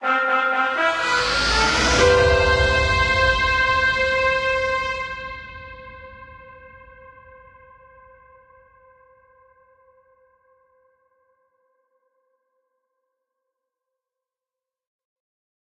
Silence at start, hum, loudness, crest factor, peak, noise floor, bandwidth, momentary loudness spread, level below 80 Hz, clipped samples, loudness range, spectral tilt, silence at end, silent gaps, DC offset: 0 s; none; -18 LUFS; 20 dB; -4 dBFS; -90 dBFS; 11.5 kHz; 21 LU; -36 dBFS; under 0.1%; 17 LU; -3.5 dB/octave; 8.95 s; none; under 0.1%